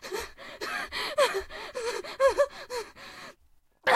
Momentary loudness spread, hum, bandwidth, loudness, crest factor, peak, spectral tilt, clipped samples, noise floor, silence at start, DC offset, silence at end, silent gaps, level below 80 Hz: 18 LU; none; 15.5 kHz; -30 LUFS; 22 dB; -8 dBFS; -1.5 dB/octave; under 0.1%; -62 dBFS; 0 s; under 0.1%; 0 s; none; -56 dBFS